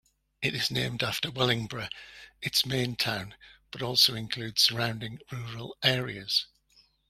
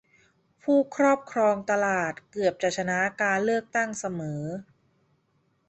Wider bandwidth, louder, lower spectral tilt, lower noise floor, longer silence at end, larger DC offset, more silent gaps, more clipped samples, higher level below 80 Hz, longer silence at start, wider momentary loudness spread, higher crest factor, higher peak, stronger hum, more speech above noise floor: first, 16 kHz vs 8.4 kHz; about the same, -27 LUFS vs -26 LUFS; second, -3 dB/octave vs -5 dB/octave; second, -65 dBFS vs -70 dBFS; second, 0.65 s vs 1.05 s; neither; neither; neither; first, -60 dBFS vs -68 dBFS; second, 0.4 s vs 0.65 s; first, 16 LU vs 10 LU; first, 24 dB vs 18 dB; about the same, -6 dBFS vs -8 dBFS; neither; second, 34 dB vs 44 dB